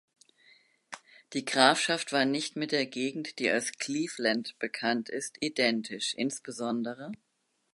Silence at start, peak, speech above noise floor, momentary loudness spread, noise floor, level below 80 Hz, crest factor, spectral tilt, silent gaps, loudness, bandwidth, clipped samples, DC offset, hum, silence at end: 0.9 s; -4 dBFS; 33 dB; 16 LU; -63 dBFS; -82 dBFS; 26 dB; -2.5 dB/octave; none; -30 LUFS; 11.5 kHz; under 0.1%; under 0.1%; none; 0.6 s